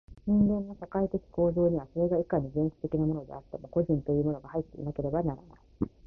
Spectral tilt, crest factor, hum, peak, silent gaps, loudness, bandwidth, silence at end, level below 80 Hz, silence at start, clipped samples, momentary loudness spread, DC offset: -12.5 dB/octave; 16 dB; none; -12 dBFS; none; -30 LUFS; 2.5 kHz; 0 s; -50 dBFS; 0.1 s; under 0.1%; 11 LU; under 0.1%